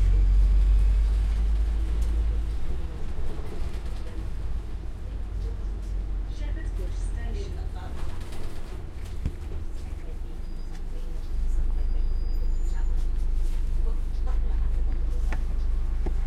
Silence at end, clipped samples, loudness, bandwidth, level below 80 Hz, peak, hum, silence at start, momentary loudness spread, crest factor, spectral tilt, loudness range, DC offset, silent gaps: 0 s; under 0.1%; -31 LUFS; 9 kHz; -26 dBFS; -12 dBFS; none; 0 s; 13 LU; 12 dB; -7 dB/octave; 8 LU; under 0.1%; none